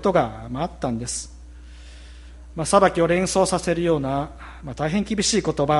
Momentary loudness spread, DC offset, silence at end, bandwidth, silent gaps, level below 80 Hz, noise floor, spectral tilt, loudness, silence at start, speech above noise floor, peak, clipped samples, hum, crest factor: 17 LU; under 0.1%; 0 s; 11.5 kHz; none; -42 dBFS; -41 dBFS; -4.5 dB/octave; -22 LUFS; 0 s; 20 dB; -2 dBFS; under 0.1%; none; 20 dB